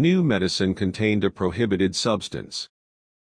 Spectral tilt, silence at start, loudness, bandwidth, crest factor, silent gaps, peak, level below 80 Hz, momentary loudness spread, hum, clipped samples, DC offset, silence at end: -5.5 dB/octave; 0 s; -23 LUFS; 10.5 kHz; 16 dB; none; -8 dBFS; -52 dBFS; 11 LU; none; under 0.1%; under 0.1%; 0.65 s